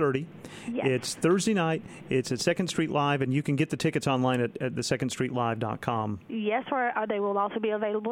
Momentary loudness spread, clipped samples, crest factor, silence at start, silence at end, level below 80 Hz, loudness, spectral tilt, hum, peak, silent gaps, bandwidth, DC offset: 6 LU; under 0.1%; 18 dB; 0 s; 0 s; -64 dBFS; -28 LUFS; -5.5 dB/octave; none; -10 dBFS; none; 16.5 kHz; under 0.1%